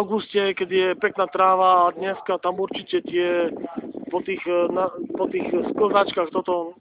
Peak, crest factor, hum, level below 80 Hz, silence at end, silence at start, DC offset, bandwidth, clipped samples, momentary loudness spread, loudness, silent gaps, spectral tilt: -4 dBFS; 18 dB; none; -64 dBFS; 0.1 s; 0 s; under 0.1%; 4 kHz; under 0.1%; 10 LU; -22 LUFS; none; -9 dB/octave